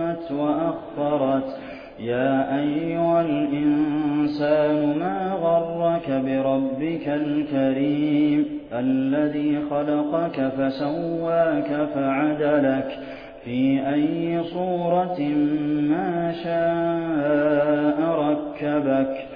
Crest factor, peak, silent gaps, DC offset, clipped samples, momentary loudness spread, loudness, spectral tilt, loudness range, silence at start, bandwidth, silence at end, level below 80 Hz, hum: 14 dB; -8 dBFS; none; under 0.1%; under 0.1%; 5 LU; -23 LUFS; -10 dB/octave; 1 LU; 0 s; 5.2 kHz; 0 s; -56 dBFS; none